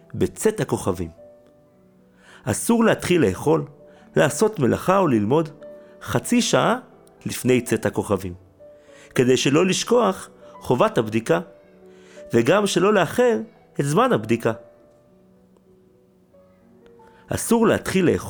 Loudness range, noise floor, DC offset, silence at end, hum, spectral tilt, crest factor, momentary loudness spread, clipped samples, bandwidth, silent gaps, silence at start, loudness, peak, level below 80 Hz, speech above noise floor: 5 LU; -56 dBFS; under 0.1%; 0 s; none; -5 dB/octave; 18 dB; 13 LU; under 0.1%; over 20 kHz; none; 0.15 s; -21 LUFS; -4 dBFS; -54 dBFS; 36 dB